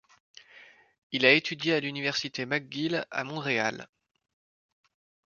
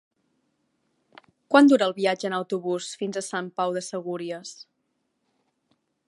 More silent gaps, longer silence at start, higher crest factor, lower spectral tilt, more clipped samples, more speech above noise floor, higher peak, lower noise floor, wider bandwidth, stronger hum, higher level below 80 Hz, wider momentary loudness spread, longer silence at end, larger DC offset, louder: first, 0.98-1.10 s vs none; second, 0.55 s vs 1.5 s; about the same, 26 dB vs 24 dB; about the same, -4 dB/octave vs -4.5 dB/octave; neither; second, 27 dB vs 52 dB; second, -6 dBFS vs -2 dBFS; second, -55 dBFS vs -75 dBFS; second, 7.2 kHz vs 11.5 kHz; neither; about the same, -76 dBFS vs -80 dBFS; second, 11 LU vs 15 LU; about the same, 1.45 s vs 1.55 s; neither; second, -27 LUFS vs -24 LUFS